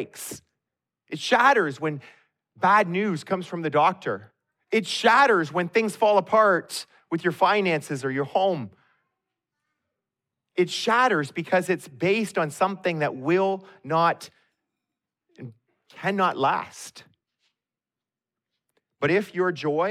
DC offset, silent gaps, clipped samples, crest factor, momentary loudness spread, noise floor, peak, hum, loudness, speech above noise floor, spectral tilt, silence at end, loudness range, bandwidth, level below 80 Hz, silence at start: under 0.1%; none; under 0.1%; 20 dB; 15 LU; under -90 dBFS; -6 dBFS; none; -23 LUFS; over 67 dB; -5 dB/octave; 0 s; 8 LU; 15 kHz; -76 dBFS; 0 s